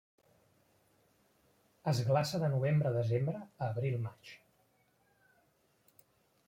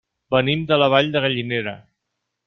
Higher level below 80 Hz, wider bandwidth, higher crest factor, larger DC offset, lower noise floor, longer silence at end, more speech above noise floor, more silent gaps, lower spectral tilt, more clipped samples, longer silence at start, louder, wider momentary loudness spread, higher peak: second, -72 dBFS vs -56 dBFS; first, 16.5 kHz vs 6.4 kHz; about the same, 20 dB vs 20 dB; neither; second, -73 dBFS vs -78 dBFS; first, 2.1 s vs 0.65 s; second, 40 dB vs 59 dB; neither; about the same, -7 dB/octave vs -7 dB/octave; neither; first, 1.85 s vs 0.3 s; second, -34 LUFS vs -19 LUFS; about the same, 11 LU vs 9 LU; second, -18 dBFS vs -2 dBFS